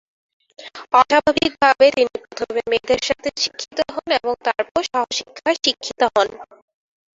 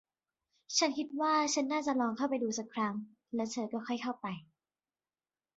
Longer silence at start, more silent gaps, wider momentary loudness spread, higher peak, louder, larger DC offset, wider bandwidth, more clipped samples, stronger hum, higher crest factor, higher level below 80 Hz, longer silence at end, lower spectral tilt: about the same, 0.6 s vs 0.7 s; first, 4.71-4.75 s vs none; about the same, 10 LU vs 11 LU; first, -2 dBFS vs -18 dBFS; first, -19 LUFS vs -34 LUFS; neither; about the same, 7.8 kHz vs 7.6 kHz; neither; neither; about the same, 18 dB vs 18 dB; first, -54 dBFS vs -80 dBFS; second, 0.75 s vs 1.15 s; about the same, -2 dB/octave vs -2.5 dB/octave